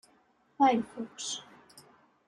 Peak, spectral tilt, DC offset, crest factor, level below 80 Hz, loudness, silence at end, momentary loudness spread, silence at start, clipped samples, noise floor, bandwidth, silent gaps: -14 dBFS; -3 dB/octave; under 0.1%; 20 dB; -76 dBFS; -30 LUFS; 0.45 s; 14 LU; 0.6 s; under 0.1%; -67 dBFS; 12 kHz; none